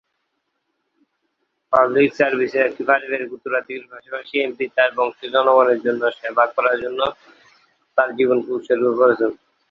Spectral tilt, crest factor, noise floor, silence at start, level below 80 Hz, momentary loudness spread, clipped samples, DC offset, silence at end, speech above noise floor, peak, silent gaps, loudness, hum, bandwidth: -6 dB/octave; 18 dB; -73 dBFS; 1.7 s; -64 dBFS; 9 LU; under 0.1%; under 0.1%; 0.35 s; 55 dB; -2 dBFS; none; -19 LUFS; none; 6.8 kHz